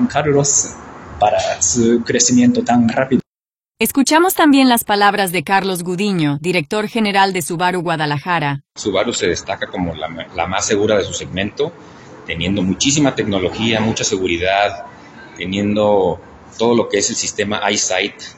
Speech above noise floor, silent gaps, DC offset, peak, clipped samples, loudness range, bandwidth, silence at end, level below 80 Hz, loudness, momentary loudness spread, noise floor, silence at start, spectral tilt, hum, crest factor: over 74 dB; 3.26-3.35 s; under 0.1%; 0 dBFS; under 0.1%; 5 LU; 16.5 kHz; 0.05 s; -46 dBFS; -16 LUFS; 10 LU; under -90 dBFS; 0 s; -3.5 dB/octave; none; 16 dB